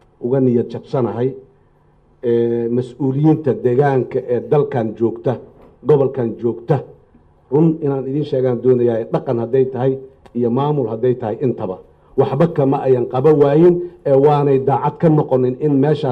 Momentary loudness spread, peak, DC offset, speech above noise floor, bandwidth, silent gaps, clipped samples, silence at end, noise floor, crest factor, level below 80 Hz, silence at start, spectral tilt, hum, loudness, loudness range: 8 LU; -4 dBFS; under 0.1%; 37 dB; 5.6 kHz; none; under 0.1%; 0 s; -53 dBFS; 14 dB; -54 dBFS; 0.2 s; -10.5 dB/octave; none; -17 LUFS; 5 LU